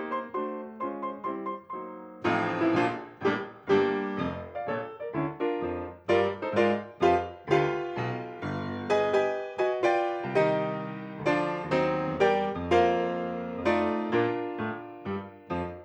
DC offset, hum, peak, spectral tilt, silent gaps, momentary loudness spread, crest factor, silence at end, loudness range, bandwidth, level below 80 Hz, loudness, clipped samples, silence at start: under 0.1%; none; -10 dBFS; -7 dB/octave; none; 11 LU; 18 dB; 0 s; 3 LU; 8.6 kHz; -60 dBFS; -29 LUFS; under 0.1%; 0 s